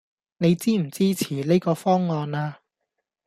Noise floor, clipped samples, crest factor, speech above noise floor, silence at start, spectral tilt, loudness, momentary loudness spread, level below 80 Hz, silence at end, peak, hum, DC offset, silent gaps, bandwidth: -81 dBFS; under 0.1%; 16 dB; 59 dB; 0.4 s; -6.5 dB/octave; -23 LUFS; 7 LU; -64 dBFS; 0.75 s; -8 dBFS; none; under 0.1%; none; 15 kHz